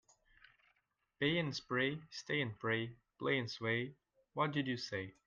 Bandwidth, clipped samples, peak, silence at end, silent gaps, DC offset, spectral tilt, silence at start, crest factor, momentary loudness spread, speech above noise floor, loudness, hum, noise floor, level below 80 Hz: 7.6 kHz; under 0.1%; -20 dBFS; 0.15 s; none; under 0.1%; -5.5 dB/octave; 1.2 s; 20 dB; 8 LU; 42 dB; -38 LUFS; none; -81 dBFS; -76 dBFS